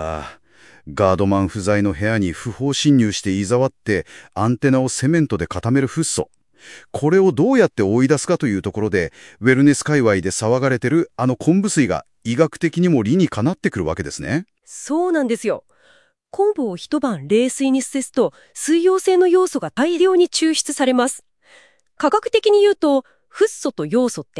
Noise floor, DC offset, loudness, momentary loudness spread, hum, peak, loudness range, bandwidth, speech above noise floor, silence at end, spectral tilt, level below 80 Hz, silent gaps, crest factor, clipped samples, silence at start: -55 dBFS; 0.1%; -18 LUFS; 9 LU; none; 0 dBFS; 4 LU; 12 kHz; 38 dB; 0 s; -5.5 dB/octave; -52 dBFS; none; 18 dB; under 0.1%; 0 s